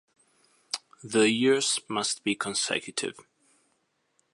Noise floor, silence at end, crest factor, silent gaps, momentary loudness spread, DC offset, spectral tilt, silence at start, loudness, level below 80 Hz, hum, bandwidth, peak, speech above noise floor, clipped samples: -74 dBFS; 1.15 s; 20 dB; none; 14 LU; under 0.1%; -2.5 dB/octave; 0.75 s; -27 LUFS; -74 dBFS; none; 11.5 kHz; -8 dBFS; 47 dB; under 0.1%